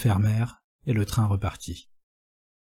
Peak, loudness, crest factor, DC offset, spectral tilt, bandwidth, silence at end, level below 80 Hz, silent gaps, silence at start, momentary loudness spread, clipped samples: -12 dBFS; -26 LUFS; 16 dB; under 0.1%; -6.5 dB/octave; 14.5 kHz; 0.85 s; -46 dBFS; 0.64-0.79 s; 0 s; 15 LU; under 0.1%